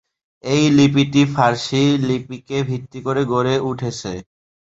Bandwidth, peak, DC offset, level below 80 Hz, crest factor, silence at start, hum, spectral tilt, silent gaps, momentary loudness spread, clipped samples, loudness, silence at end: 8 kHz; 0 dBFS; under 0.1%; -52 dBFS; 18 dB; 0.45 s; none; -6 dB/octave; none; 12 LU; under 0.1%; -18 LUFS; 0.55 s